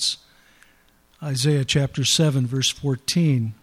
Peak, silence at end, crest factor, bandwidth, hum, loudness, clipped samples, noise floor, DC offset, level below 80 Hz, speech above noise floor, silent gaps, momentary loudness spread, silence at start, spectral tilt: -6 dBFS; 0.1 s; 16 dB; 15 kHz; none; -21 LUFS; under 0.1%; -58 dBFS; under 0.1%; -54 dBFS; 37 dB; none; 8 LU; 0 s; -4.5 dB/octave